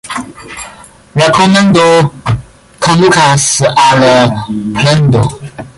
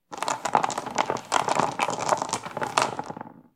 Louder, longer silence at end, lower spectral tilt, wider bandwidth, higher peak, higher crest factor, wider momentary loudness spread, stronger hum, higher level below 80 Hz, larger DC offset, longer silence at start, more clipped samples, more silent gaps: first, -8 LUFS vs -26 LUFS; about the same, 0.1 s vs 0.15 s; first, -4.5 dB/octave vs -2.5 dB/octave; second, 11.5 kHz vs 16.5 kHz; about the same, 0 dBFS vs -2 dBFS; second, 10 dB vs 26 dB; first, 18 LU vs 6 LU; neither; first, -36 dBFS vs -66 dBFS; neither; about the same, 0.05 s vs 0.1 s; neither; neither